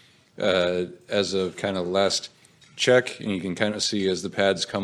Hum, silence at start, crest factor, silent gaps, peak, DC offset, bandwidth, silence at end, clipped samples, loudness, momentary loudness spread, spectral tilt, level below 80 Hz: none; 0.4 s; 20 dB; none; -4 dBFS; under 0.1%; 13 kHz; 0 s; under 0.1%; -24 LUFS; 8 LU; -3.5 dB/octave; -68 dBFS